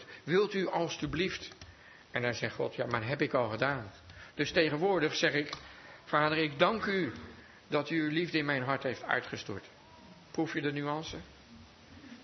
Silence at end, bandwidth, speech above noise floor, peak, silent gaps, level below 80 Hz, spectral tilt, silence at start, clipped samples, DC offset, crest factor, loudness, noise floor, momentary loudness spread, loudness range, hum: 0 s; 6.2 kHz; 23 dB; -10 dBFS; none; -64 dBFS; -3.5 dB/octave; 0 s; under 0.1%; under 0.1%; 24 dB; -32 LUFS; -55 dBFS; 18 LU; 4 LU; none